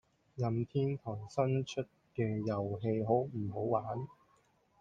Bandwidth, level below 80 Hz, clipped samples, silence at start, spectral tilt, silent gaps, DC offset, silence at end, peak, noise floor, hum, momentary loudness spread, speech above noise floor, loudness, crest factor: 7.8 kHz; -70 dBFS; under 0.1%; 0.35 s; -8 dB/octave; none; under 0.1%; 0.7 s; -16 dBFS; -71 dBFS; none; 9 LU; 36 dB; -36 LUFS; 18 dB